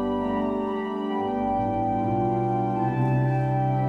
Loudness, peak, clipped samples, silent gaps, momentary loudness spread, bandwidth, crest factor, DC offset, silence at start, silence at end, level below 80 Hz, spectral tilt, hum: -25 LUFS; -12 dBFS; under 0.1%; none; 4 LU; 4.1 kHz; 12 dB; under 0.1%; 0 s; 0 s; -48 dBFS; -10 dB/octave; none